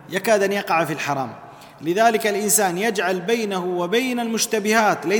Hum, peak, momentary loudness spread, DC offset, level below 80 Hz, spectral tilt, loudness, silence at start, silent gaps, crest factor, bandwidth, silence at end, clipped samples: none; -2 dBFS; 7 LU; under 0.1%; -66 dBFS; -3 dB/octave; -20 LUFS; 0 s; none; 18 dB; 19 kHz; 0 s; under 0.1%